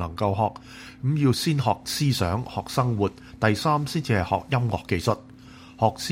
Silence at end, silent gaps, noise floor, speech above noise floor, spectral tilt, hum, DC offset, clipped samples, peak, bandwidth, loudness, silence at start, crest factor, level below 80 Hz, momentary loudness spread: 0 s; none; -46 dBFS; 22 dB; -5.5 dB/octave; none; under 0.1%; under 0.1%; -4 dBFS; 16 kHz; -25 LUFS; 0 s; 20 dB; -50 dBFS; 6 LU